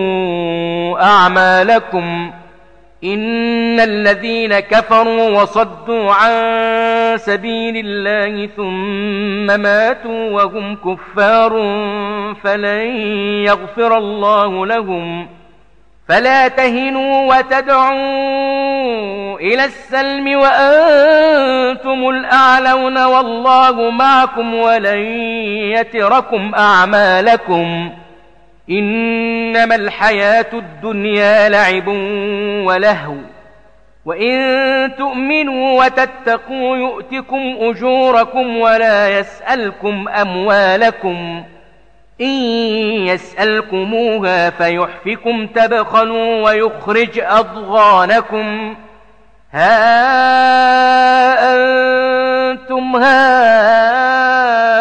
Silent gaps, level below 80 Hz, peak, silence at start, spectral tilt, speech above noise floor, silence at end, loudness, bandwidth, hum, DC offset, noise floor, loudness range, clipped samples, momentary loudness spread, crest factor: none; -50 dBFS; -2 dBFS; 0 s; -5 dB/octave; 38 dB; 0 s; -12 LUFS; 9 kHz; none; under 0.1%; -50 dBFS; 5 LU; under 0.1%; 10 LU; 12 dB